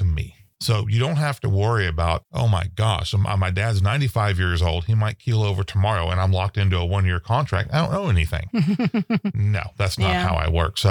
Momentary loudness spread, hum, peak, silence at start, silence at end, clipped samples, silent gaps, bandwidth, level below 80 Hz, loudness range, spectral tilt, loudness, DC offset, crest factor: 3 LU; none; -4 dBFS; 0 s; 0 s; under 0.1%; none; 15.5 kHz; -34 dBFS; 1 LU; -6.5 dB/octave; -22 LUFS; under 0.1%; 16 dB